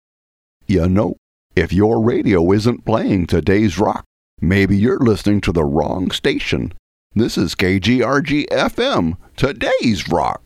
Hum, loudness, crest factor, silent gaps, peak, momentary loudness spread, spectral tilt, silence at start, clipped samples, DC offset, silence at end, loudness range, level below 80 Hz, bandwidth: none; -17 LUFS; 16 dB; 1.18-1.50 s, 4.06-4.37 s, 6.79-7.10 s; 0 dBFS; 7 LU; -6.5 dB/octave; 0.7 s; under 0.1%; under 0.1%; 0.1 s; 2 LU; -36 dBFS; 15 kHz